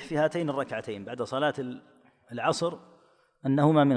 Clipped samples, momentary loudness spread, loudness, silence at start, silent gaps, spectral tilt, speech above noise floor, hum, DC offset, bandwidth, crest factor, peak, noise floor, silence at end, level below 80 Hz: under 0.1%; 15 LU; -29 LUFS; 0 s; none; -6.5 dB/octave; 35 dB; none; under 0.1%; 10.5 kHz; 18 dB; -10 dBFS; -62 dBFS; 0 s; -70 dBFS